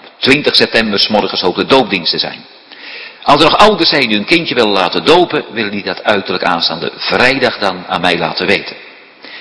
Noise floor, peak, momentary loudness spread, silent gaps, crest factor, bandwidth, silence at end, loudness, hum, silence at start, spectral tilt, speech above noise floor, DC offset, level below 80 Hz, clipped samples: -35 dBFS; 0 dBFS; 11 LU; none; 12 dB; 11 kHz; 0 s; -11 LUFS; none; 0.05 s; -4.5 dB/octave; 23 dB; under 0.1%; -44 dBFS; 1%